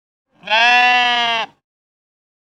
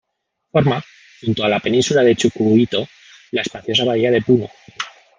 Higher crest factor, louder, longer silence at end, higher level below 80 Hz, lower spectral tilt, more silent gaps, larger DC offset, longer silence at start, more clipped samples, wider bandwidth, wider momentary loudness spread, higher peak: about the same, 18 dB vs 16 dB; first, -13 LUFS vs -17 LUFS; first, 1.05 s vs 0.3 s; second, -66 dBFS vs -54 dBFS; second, -0.5 dB/octave vs -5.5 dB/octave; neither; neither; about the same, 0.45 s vs 0.55 s; neither; first, 11.5 kHz vs 9.8 kHz; second, 11 LU vs 14 LU; about the same, 0 dBFS vs -2 dBFS